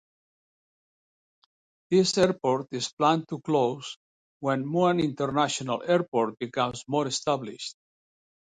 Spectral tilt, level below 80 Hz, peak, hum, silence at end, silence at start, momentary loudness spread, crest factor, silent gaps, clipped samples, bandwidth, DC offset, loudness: -5 dB/octave; -66 dBFS; -8 dBFS; none; 0.85 s; 1.9 s; 10 LU; 20 dB; 2.93-2.97 s, 3.96-4.40 s, 6.08-6.12 s; under 0.1%; 10.5 kHz; under 0.1%; -26 LUFS